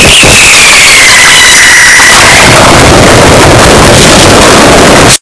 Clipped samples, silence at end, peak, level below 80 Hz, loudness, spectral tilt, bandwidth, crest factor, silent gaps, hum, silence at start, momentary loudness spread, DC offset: 100%; 0.05 s; 0 dBFS; -16 dBFS; 2 LUFS; -2.5 dB/octave; 11 kHz; 0 dB; none; none; 0 s; 2 LU; under 0.1%